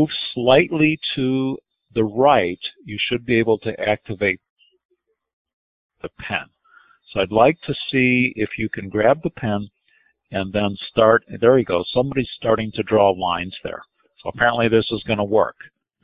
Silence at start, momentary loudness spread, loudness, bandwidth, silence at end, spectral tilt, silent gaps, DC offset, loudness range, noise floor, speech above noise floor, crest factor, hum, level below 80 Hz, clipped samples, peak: 0 s; 14 LU; -20 LUFS; 5.2 kHz; 0.55 s; -10.5 dB/octave; 4.50-4.56 s, 4.85-4.89 s, 5.33-5.45 s, 5.53-5.90 s; under 0.1%; 6 LU; -62 dBFS; 42 dB; 20 dB; none; -50 dBFS; under 0.1%; 0 dBFS